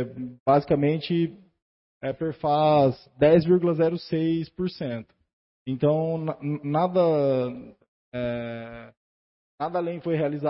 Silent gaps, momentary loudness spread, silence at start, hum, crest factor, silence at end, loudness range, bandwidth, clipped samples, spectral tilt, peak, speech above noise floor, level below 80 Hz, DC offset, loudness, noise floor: 0.40-0.46 s, 1.62-2.01 s, 5.33-5.66 s, 7.88-8.12 s, 8.97-9.58 s; 15 LU; 0 s; none; 18 dB; 0 s; 5 LU; 5.8 kHz; under 0.1%; -12 dB/octave; -6 dBFS; over 66 dB; -58 dBFS; under 0.1%; -25 LUFS; under -90 dBFS